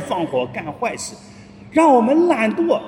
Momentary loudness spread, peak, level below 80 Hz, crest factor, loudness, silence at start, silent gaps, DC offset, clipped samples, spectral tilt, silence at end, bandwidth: 13 LU; -2 dBFS; -58 dBFS; 16 dB; -17 LUFS; 0 s; none; under 0.1%; under 0.1%; -5 dB/octave; 0 s; 12 kHz